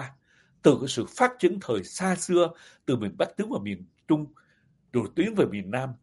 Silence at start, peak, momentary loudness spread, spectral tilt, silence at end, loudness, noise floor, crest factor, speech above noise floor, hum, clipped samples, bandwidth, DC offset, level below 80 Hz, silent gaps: 0 s; -4 dBFS; 10 LU; -5.5 dB/octave; 0.05 s; -27 LUFS; -65 dBFS; 22 dB; 39 dB; none; under 0.1%; 11.5 kHz; under 0.1%; -66 dBFS; none